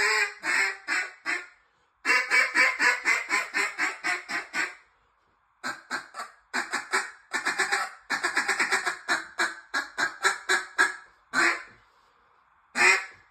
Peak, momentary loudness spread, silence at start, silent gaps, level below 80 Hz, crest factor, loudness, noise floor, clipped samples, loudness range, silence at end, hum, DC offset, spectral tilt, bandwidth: -6 dBFS; 12 LU; 0 s; none; -76 dBFS; 22 dB; -26 LUFS; -68 dBFS; under 0.1%; 7 LU; 0.2 s; none; under 0.1%; 0.5 dB/octave; 16 kHz